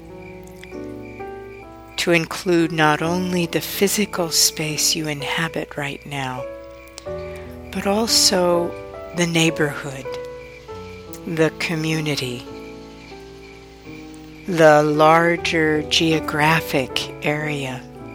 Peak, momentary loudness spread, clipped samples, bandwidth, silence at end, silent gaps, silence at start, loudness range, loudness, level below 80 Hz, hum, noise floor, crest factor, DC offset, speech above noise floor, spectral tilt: 0 dBFS; 23 LU; under 0.1%; over 20 kHz; 0 s; none; 0 s; 9 LU; -19 LUFS; -48 dBFS; none; -41 dBFS; 20 dB; under 0.1%; 22 dB; -3.5 dB/octave